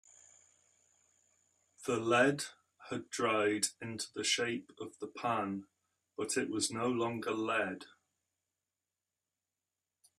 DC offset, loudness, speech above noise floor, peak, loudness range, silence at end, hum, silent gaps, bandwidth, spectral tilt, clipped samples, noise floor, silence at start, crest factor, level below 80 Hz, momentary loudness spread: under 0.1%; -35 LUFS; over 55 dB; -16 dBFS; 4 LU; 2.35 s; none; none; 14.5 kHz; -3 dB/octave; under 0.1%; under -90 dBFS; 1.8 s; 22 dB; -80 dBFS; 14 LU